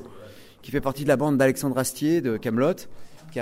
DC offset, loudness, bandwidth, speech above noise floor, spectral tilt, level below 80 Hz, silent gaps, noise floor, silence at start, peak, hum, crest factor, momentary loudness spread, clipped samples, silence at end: under 0.1%; -24 LUFS; 16 kHz; 22 dB; -5.5 dB/octave; -52 dBFS; none; -45 dBFS; 0 s; -8 dBFS; none; 18 dB; 11 LU; under 0.1%; 0 s